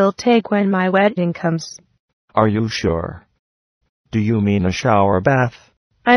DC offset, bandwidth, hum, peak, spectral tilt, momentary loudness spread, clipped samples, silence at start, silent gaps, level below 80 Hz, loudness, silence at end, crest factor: under 0.1%; 11 kHz; none; 0 dBFS; -6.5 dB/octave; 9 LU; under 0.1%; 0 s; 2.00-2.28 s, 3.39-3.81 s, 3.89-4.04 s, 5.77-5.90 s; -44 dBFS; -18 LUFS; 0 s; 18 dB